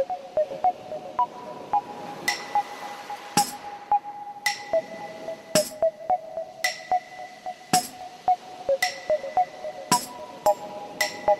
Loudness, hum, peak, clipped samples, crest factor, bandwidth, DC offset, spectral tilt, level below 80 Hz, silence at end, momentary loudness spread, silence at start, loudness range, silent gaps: -27 LUFS; none; -6 dBFS; under 0.1%; 22 dB; 16 kHz; under 0.1%; -2 dB/octave; -66 dBFS; 0 s; 12 LU; 0 s; 2 LU; none